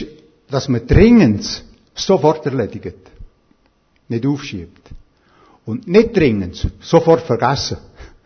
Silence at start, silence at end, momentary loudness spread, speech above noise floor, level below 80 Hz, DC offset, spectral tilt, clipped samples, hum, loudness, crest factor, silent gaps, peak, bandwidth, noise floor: 0 s; 0.2 s; 19 LU; 43 dB; -32 dBFS; under 0.1%; -6.5 dB/octave; under 0.1%; none; -15 LUFS; 16 dB; none; 0 dBFS; 6.6 kHz; -58 dBFS